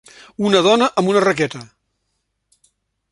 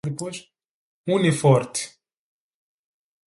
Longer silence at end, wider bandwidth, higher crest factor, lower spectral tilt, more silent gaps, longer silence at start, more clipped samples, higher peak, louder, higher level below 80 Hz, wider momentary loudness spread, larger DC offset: about the same, 1.45 s vs 1.4 s; about the same, 11.5 kHz vs 11.5 kHz; about the same, 18 dB vs 22 dB; about the same, -4.5 dB/octave vs -5.5 dB/octave; second, none vs 0.65-1.04 s; first, 0.4 s vs 0.05 s; neither; about the same, 0 dBFS vs -2 dBFS; first, -16 LUFS vs -22 LUFS; about the same, -60 dBFS vs -64 dBFS; about the same, 16 LU vs 17 LU; neither